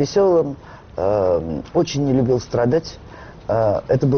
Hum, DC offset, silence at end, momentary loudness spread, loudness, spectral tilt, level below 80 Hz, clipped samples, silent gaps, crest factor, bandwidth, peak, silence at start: none; under 0.1%; 0 s; 17 LU; -19 LUFS; -7 dB/octave; -44 dBFS; under 0.1%; none; 12 dB; 6.6 kHz; -6 dBFS; 0 s